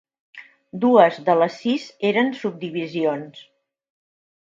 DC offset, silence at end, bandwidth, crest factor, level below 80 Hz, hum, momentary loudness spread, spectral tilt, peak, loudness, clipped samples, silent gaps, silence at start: under 0.1%; 1.2 s; 7.6 kHz; 22 dB; -74 dBFS; none; 14 LU; -6.5 dB/octave; 0 dBFS; -20 LUFS; under 0.1%; none; 0.35 s